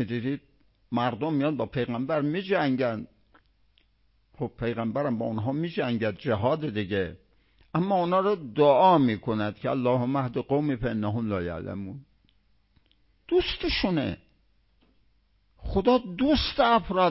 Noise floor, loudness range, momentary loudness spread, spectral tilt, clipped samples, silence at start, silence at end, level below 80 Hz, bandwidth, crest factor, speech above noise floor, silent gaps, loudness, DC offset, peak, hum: -67 dBFS; 7 LU; 11 LU; -10.5 dB/octave; under 0.1%; 0 s; 0 s; -48 dBFS; 5.8 kHz; 18 dB; 41 dB; none; -26 LUFS; under 0.1%; -8 dBFS; none